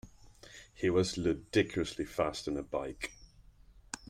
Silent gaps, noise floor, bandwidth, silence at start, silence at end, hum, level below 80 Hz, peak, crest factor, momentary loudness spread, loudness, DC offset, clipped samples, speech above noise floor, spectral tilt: none; -59 dBFS; 15.5 kHz; 0.05 s; 0 s; none; -56 dBFS; -16 dBFS; 20 dB; 16 LU; -34 LUFS; under 0.1%; under 0.1%; 26 dB; -5 dB/octave